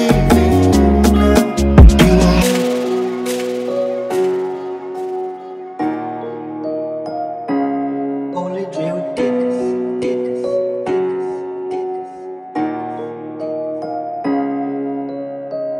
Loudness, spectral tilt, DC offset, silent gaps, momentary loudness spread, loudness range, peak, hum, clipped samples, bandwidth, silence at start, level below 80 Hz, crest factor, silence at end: -17 LUFS; -6.5 dB/octave; under 0.1%; none; 14 LU; 10 LU; 0 dBFS; none; under 0.1%; 16 kHz; 0 s; -22 dBFS; 16 dB; 0 s